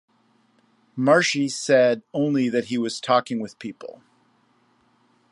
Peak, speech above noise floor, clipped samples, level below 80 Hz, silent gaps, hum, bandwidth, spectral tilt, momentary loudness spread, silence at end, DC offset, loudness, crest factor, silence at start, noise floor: -4 dBFS; 41 dB; under 0.1%; -74 dBFS; none; none; 11.5 kHz; -4.5 dB/octave; 18 LU; 1.45 s; under 0.1%; -21 LUFS; 20 dB; 0.95 s; -63 dBFS